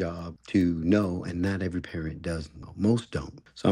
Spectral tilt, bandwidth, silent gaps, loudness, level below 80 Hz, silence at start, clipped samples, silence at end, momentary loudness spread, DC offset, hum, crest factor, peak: -7.5 dB/octave; 11.5 kHz; none; -29 LUFS; -48 dBFS; 0 s; under 0.1%; 0 s; 11 LU; under 0.1%; none; 18 dB; -10 dBFS